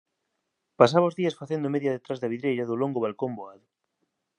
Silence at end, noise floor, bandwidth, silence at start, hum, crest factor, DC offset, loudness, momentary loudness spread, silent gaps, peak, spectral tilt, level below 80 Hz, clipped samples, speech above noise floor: 0.85 s; -80 dBFS; 10.5 kHz; 0.8 s; none; 24 dB; under 0.1%; -26 LUFS; 13 LU; none; -4 dBFS; -7 dB/octave; -76 dBFS; under 0.1%; 54 dB